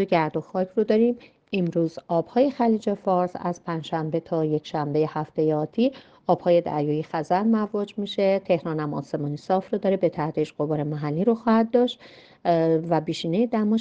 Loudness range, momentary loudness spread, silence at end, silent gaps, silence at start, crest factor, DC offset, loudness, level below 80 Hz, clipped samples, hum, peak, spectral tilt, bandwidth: 2 LU; 8 LU; 0 s; none; 0 s; 18 dB; under 0.1%; -24 LUFS; -64 dBFS; under 0.1%; none; -6 dBFS; -8 dB/octave; 8 kHz